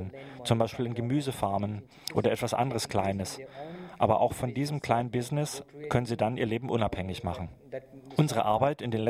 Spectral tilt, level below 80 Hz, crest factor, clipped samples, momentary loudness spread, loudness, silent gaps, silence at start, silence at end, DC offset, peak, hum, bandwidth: -6 dB/octave; -56 dBFS; 22 dB; under 0.1%; 13 LU; -30 LUFS; none; 0 s; 0 s; under 0.1%; -8 dBFS; none; 16 kHz